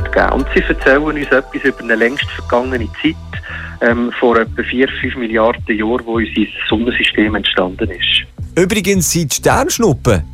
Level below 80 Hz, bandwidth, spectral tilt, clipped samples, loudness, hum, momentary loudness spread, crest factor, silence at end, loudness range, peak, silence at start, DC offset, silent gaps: -30 dBFS; 16 kHz; -4 dB/octave; under 0.1%; -14 LUFS; none; 6 LU; 14 dB; 0 s; 2 LU; 0 dBFS; 0 s; under 0.1%; none